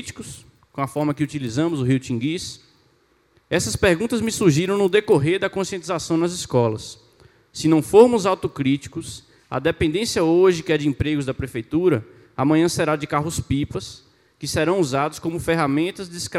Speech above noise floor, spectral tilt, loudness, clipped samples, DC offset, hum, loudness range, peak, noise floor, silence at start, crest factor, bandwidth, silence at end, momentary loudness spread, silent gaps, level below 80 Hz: 40 dB; -5.5 dB/octave; -21 LUFS; under 0.1%; under 0.1%; none; 4 LU; 0 dBFS; -61 dBFS; 0 s; 20 dB; 15.5 kHz; 0 s; 15 LU; none; -48 dBFS